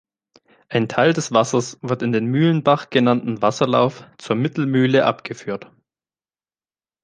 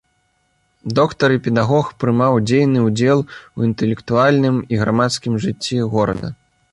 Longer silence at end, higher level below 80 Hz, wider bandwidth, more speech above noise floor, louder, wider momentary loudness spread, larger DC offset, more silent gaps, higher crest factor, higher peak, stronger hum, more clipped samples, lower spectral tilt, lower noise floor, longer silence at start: first, 1.4 s vs 0.4 s; second, -64 dBFS vs -48 dBFS; second, 9.8 kHz vs 11.5 kHz; first, over 71 dB vs 48 dB; about the same, -19 LUFS vs -17 LUFS; first, 12 LU vs 7 LU; neither; neither; first, 20 dB vs 14 dB; about the same, 0 dBFS vs -2 dBFS; neither; neither; about the same, -6 dB/octave vs -6.5 dB/octave; first, under -90 dBFS vs -64 dBFS; second, 0.7 s vs 0.85 s